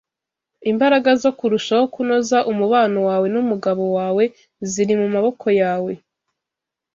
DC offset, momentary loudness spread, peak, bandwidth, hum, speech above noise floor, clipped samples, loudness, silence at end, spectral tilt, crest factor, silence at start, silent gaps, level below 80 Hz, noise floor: under 0.1%; 8 LU; -4 dBFS; 7.8 kHz; none; 68 dB; under 0.1%; -18 LUFS; 1 s; -5 dB/octave; 16 dB; 0.6 s; none; -64 dBFS; -85 dBFS